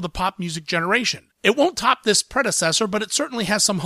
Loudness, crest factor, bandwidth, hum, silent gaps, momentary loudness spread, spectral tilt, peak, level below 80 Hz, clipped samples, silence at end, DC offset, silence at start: -20 LUFS; 18 dB; 15.5 kHz; none; none; 6 LU; -2.5 dB/octave; -2 dBFS; -48 dBFS; under 0.1%; 0 s; under 0.1%; 0 s